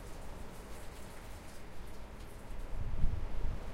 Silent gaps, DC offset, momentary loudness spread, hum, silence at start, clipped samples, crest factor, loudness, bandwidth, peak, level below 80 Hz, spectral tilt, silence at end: none; under 0.1%; 11 LU; none; 0 s; under 0.1%; 20 dB; -46 LUFS; 13 kHz; -16 dBFS; -40 dBFS; -6 dB/octave; 0 s